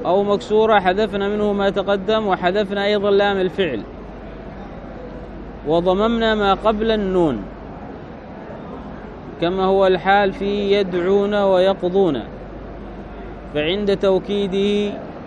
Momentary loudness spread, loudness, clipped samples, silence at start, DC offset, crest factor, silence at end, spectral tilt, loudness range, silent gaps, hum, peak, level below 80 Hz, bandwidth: 18 LU; -18 LUFS; under 0.1%; 0 s; under 0.1%; 18 dB; 0 s; -6.5 dB/octave; 4 LU; none; none; -2 dBFS; -40 dBFS; 9.2 kHz